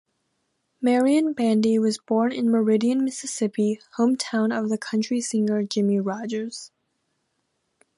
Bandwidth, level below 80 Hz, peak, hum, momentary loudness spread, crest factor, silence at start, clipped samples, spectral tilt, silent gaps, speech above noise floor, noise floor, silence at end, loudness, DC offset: 11.5 kHz; -74 dBFS; -10 dBFS; none; 7 LU; 14 dB; 0.8 s; under 0.1%; -5 dB/octave; none; 52 dB; -74 dBFS; 1.3 s; -23 LUFS; under 0.1%